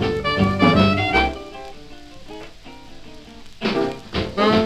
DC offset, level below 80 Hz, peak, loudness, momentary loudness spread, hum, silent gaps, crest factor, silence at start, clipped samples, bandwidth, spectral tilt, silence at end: under 0.1%; -38 dBFS; -2 dBFS; -19 LUFS; 23 LU; none; none; 20 dB; 0 s; under 0.1%; 12.5 kHz; -6.5 dB/octave; 0 s